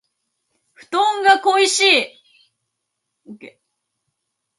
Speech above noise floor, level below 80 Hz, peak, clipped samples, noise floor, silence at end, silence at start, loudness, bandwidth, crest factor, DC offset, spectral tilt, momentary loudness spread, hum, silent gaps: 61 dB; -78 dBFS; 0 dBFS; under 0.1%; -77 dBFS; 1.1 s; 0.9 s; -15 LUFS; 11.5 kHz; 20 dB; under 0.1%; 0 dB/octave; 9 LU; none; none